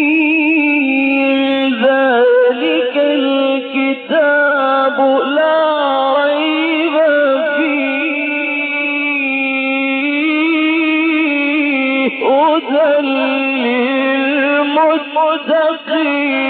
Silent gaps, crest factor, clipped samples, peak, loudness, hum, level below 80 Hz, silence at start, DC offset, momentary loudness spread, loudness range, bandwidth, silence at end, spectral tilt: none; 10 dB; under 0.1%; -2 dBFS; -13 LUFS; none; -68 dBFS; 0 s; under 0.1%; 4 LU; 1 LU; 4.5 kHz; 0 s; -6.5 dB/octave